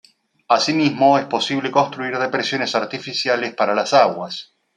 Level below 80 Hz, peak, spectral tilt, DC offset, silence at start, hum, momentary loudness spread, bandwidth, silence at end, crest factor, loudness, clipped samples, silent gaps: -68 dBFS; -2 dBFS; -4 dB/octave; under 0.1%; 0.5 s; none; 7 LU; 10.5 kHz; 0.35 s; 18 dB; -18 LUFS; under 0.1%; none